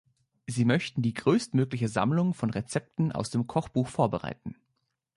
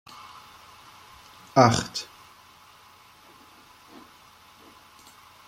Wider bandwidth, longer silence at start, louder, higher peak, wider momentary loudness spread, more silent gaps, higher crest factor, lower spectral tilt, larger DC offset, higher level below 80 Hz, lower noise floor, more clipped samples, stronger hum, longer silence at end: second, 11.5 kHz vs 16 kHz; second, 0.5 s vs 1.55 s; second, -28 LUFS vs -22 LUFS; second, -10 dBFS vs -2 dBFS; second, 10 LU vs 30 LU; neither; second, 18 dB vs 28 dB; first, -6.5 dB/octave vs -5 dB/octave; neither; about the same, -60 dBFS vs -60 dBFS; first, -79 dBFS vs -53 dBFS; neither; neither; second, 0.65 s vs 3.45 s